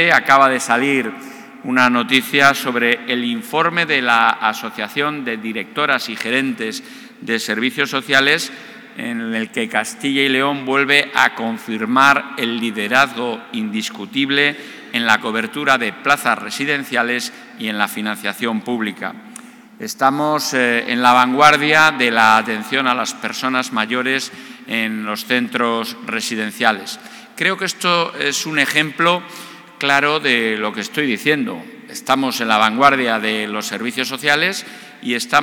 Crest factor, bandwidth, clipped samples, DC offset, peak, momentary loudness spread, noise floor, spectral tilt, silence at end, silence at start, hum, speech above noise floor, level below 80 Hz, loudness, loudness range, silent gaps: 18 dB; 19.5 kHz; under 0.1%; under 0.1%; 0 dBFS; 14 LU; -39 dBFS; -3 dB/octave; 0 s; 0 s; none; 22 dB; -66 dBFS; -16 LUFS; 6 LU; none